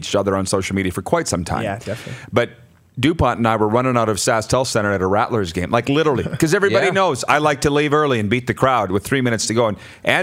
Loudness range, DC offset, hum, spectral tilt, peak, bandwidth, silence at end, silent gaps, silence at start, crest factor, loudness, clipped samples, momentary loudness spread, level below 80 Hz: 3 LU; under 0.1%; none; -5 dB/octave; 0 dBFS; 16 kHz; 0 s; none; 0 s; 18 dB; -18 LUFS; under 0.1%; 6 LU; -44 dBFS